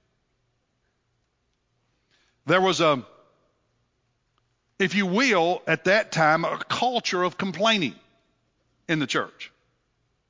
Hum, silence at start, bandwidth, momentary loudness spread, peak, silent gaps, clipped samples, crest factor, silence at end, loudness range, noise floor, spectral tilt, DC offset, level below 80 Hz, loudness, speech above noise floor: none; 2.45 s; 7.6 kHz; 8 LU; -6 dBFS; none; under 0.1%; 22 dB; 0.8 s; 5 LU; -73 dBFS; -4.5 dB/octave; under 0.1%; -72 dBFS; -23 LUFS; 50 dB